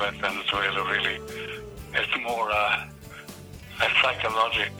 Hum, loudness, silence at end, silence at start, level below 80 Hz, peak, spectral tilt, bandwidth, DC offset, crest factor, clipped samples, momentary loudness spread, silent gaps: none; -25 LUFS; 0 s; 0 s; -50 dBFS; -8 dBFS; -3 dB/octave; over 20 kHz; under 0.1%; 20 dB; under 0.1%; 20 LU; none